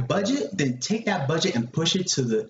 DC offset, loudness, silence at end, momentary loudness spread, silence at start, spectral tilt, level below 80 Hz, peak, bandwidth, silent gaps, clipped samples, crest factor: under 0.1%; -24 LUFS; 0 s; 3 LU; 0 s; -4 dB/octave; -60 dBFS; -10 dBFS; 8 kHz; none; under 0.1%; 16 dB